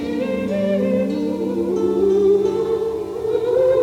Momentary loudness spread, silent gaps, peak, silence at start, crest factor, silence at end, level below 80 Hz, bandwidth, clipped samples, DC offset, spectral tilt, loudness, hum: 6 LU; none; -6 dBFS; 0 s; 12 dB; 0 s; -48 dBFS; 13.5 kHz; under 0.1%; under 0.1%; -7.5 dB/octave; -19 LUFS; none